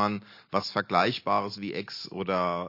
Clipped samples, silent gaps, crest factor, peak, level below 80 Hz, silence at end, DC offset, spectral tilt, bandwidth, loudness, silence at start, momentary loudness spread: under 0.1%; none; 20 dB; -8 dBFS; -74 dBFS; 0 s; under 0.1%; -5.5 dB/octave; 5.8 kHz; -29 LUFS; 0 s; 10 LU